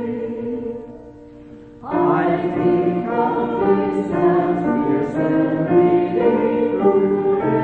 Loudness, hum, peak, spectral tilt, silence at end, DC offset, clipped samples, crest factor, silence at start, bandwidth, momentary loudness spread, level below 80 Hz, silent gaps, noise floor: -18 LUFS; none; -4 dBFS; -9.5 dB/octave; 0 s; under 0.1%; under 0.1%; 14 dB; 0 s; 4.5 kHz; 10 LU; -50 dBFS; none; -40 dBFS